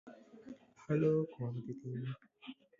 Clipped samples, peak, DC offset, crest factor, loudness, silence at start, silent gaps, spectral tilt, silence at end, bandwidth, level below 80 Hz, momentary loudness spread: under 0.1%; -22 dBFS; under 0.1%; 18 dB; -37 LUFS; 0.05 s; none; -8.5 dB/octave; 0.25 s; 7.4 kHz; -74 dBFS; 22 LU